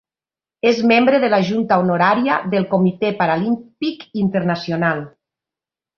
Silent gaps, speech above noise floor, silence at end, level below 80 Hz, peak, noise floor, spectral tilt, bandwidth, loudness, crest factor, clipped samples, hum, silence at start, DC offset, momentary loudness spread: none; over 73 dB; 0.9 s; -58 dBFS; -2 dBFS; under -90 dBFS; -7 dB/octave; 6.8 kHz; -17 LUFS; 16 dB; under 0.1%; none; 0.65 s; under 0.1%; 9 LU